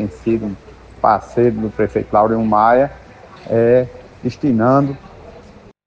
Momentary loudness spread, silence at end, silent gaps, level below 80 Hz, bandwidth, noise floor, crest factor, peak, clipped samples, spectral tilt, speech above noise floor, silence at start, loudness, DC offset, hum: 13 LU; 0.45 s; none; -44 dBFS; 7.8 kHz; -41 dBFS; 16 dB; -2 dBFS; under 0.1%; -9 dB/octave; 27 dB; 0 s; -16 LUFS; under 0.1%; none